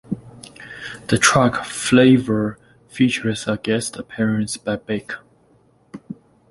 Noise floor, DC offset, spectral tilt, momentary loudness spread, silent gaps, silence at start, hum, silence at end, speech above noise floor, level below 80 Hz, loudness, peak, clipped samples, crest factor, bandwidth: -56 dBFS; under 0.1%; -4.5 dB/octave; 23 LU; none; 0.1 s; none; 0.4 s; 38 dB; -52 dBFS; -19 LUFS; 0 dBFS; under 0.1%; 20 dB; 11.5 kHz